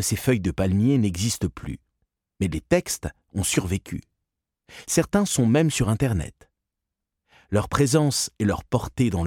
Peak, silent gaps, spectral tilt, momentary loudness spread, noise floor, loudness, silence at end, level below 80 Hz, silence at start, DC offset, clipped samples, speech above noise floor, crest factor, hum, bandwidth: -6 dBFS; none; -5 dB/octave; 12 LU; -84 dBFS; -23 LUFS; 0 s; -42 dBFS; 0 s; under 0.1%; under 0.1%; 61 dB; 18 dB; none; 18 kHz